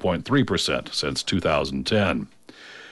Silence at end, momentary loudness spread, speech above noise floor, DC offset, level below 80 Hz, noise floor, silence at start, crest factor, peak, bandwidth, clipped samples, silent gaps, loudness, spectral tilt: 0 s; 14 LU; 21 dB; under 0.1%; -46 dBFS; -44 dBFS; 0 s; 14 dB; -10 dBFS; 11.5 kHz; under 0.1%; none; -23 LUFS; -4.5 dB/octave